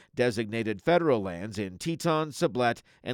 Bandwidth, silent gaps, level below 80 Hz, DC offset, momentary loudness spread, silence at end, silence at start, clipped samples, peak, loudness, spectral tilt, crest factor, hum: 17 kHz; none; -64 dBFS; under 0.1%; 10 LU; 0 s; 0.15 s; under 0.1%; -12 dBFS; -28 LUFS; -5.5 dB/octave; 18 dB; none